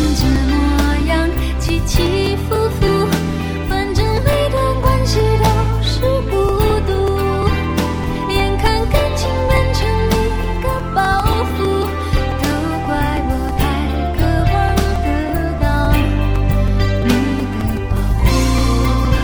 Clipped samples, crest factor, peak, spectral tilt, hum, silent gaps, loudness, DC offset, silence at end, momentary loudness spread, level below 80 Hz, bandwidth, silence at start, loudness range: under 0.1%; 14 dB; 0 dBFS; -6 dB/octave; none; none; -16 LUFS; under 0.1%; 0 s; 4 LU; -20 dBFS; over 20 kHz; 0 s; 2 LU